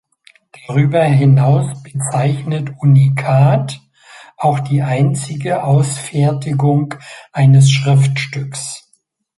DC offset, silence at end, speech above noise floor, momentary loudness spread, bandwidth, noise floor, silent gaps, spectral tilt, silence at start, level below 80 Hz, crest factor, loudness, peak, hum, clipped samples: under 0.1%; 0.6 s; 47 dB; 13 LU; 11.5 kHz; -60 dBFS; none; -6.5 dB/octave; 0.7 s; -52 dBFS; 12 dB; -14 LUFS; -2 dBFS; none; under 0.1%